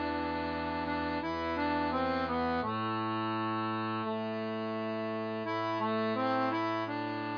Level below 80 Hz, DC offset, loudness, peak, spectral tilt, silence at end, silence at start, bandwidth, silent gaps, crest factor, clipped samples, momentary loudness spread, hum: -58 dBFS; under 0.1%; -33 LUFS; -20 dBFS; -4 dB/octave; 0 s; 0 s; 5.2 kHz; none; 14 dB; under 0.1%; 4 LU; none